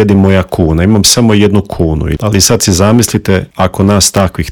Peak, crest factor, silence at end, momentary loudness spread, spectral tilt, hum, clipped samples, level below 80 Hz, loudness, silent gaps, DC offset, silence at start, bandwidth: 0 dBFS; 8 dB; 0 s; 7 LU; -4.5 dB/octave; none; 2%; -28 dBFS; -9 LUFS; none; under 0.1%; 0 s; over 20 kHz